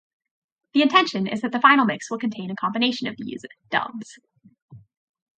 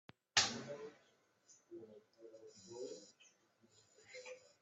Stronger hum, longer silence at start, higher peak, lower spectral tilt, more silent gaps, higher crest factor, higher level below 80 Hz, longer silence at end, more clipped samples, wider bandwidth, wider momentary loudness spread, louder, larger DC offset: neither; first, 0.75 s vs 0.35 s; first, -2 dBFS vs -16 dBFS; first, -4.5 dB/octave vs -0.5 dB/octave; first, 4.62-4.68 s vs none; second, 22 dB vs 32 dB; first, -72 dBFS vs -88 dBFS; first, 0.6 s vs 0.15 s; neither; about the same, 9 kHz vs 8.2 kHz; second, 18 LU vs 27 LU; first, -21 LUFS vs -40 LUFS; neither